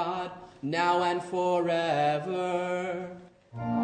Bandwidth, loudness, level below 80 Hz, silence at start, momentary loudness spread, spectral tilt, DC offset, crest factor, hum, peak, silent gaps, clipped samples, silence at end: 9.4 kHz; -29 LUFS; -66 dBFS; 0 s; 14 LU; -6 dB/octave; under 0.1%; 16 dB; none; -12 dBFS; none; under 0.1%; 0 s